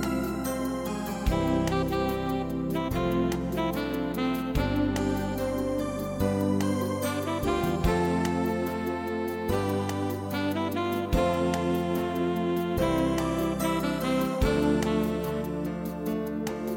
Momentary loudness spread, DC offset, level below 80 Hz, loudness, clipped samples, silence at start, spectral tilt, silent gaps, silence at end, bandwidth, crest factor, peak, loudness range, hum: 5 LU; under 0.1%; -40 dBFS; -28 LUFS; under 0.1%; 0 s; -6 dB/octave; none; 0 s; 17 kHz; 16 dB; -10 dBFS; 2 LU; none